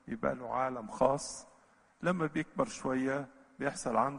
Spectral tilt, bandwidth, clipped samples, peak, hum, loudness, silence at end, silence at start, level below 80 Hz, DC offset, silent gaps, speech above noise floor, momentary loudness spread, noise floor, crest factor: -5.5 dB/octave; 10.5 kHz; under 0.1%; -12 dBFS; none; -34 LUFS; 0 s; 0.05 s; -62 dBFS; under 0.1%; none; 31 dB; 8 LU; -65 dBFS; 22 dB